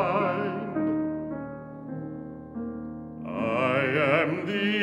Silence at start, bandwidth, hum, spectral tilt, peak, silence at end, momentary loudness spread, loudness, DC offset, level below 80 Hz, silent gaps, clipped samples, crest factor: 0 s; 10.5 kHz; none; -7.5 dB/octave; -8 dBFS; 0 s; 15 LU; -28 LUFS; under 0.1%; -60 dBFS; none; under 0.1%; 20 dB